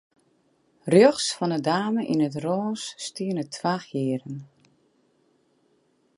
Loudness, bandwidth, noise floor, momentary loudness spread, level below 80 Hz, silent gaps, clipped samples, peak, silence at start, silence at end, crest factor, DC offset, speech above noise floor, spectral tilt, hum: -24 LUFS; 11.5 kHz; -66 dBFS; 15 LU; -72 dBFS; none; under 0.1%; -4 dBFS; 0.85 s; 1.7 s; 22 dB; under 0.1%; 43 dB; -5 dB/octave; none